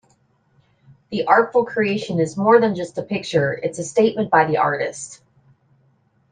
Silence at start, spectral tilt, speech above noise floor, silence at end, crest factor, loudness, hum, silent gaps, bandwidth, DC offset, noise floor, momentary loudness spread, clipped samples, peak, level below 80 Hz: 1.1 s; -5.5 dB/octave; 42 dB; 1.15 s; 20 dB; -19 LUFS; none; none; 9.6 kHz; under 0.1%; -61 dBFS; 11 LU; under 0.1%; 0 dBFS; -62 dBFS